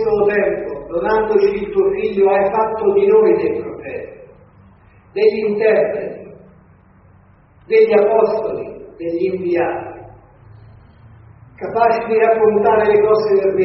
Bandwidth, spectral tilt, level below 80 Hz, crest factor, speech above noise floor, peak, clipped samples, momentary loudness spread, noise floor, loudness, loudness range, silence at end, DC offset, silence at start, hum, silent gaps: 5.8 kHz; -5 dB/octave; -50 dBFS; 16 dB; 34 dB; -2 dBFS; under 0.1%; 15 LU; -48 dBFS; -15 LUFS; 6 LU; 0 s; under 0.1%; 0 s; none; none